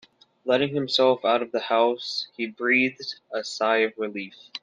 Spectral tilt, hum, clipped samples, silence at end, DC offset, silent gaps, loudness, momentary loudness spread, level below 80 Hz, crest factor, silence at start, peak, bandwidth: -4 dB/octave; none; under 0.1%; 0.05 s; under 0.1%; none; -24 LUFS; 11 LU; -76 dBFS; 18 dB; 0.45 s; -8 dBFS; 9.4 kHz